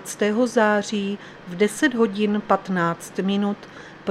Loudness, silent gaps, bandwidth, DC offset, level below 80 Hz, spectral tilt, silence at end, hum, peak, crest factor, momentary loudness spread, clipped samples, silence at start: -22 LUFS; none; 14 kHz; under 0.1%; -62 dBFS; -5 dB/octave; 0 s; none; -4 dBFS; 20 dB; 13 LU; under 0.1%; 0 s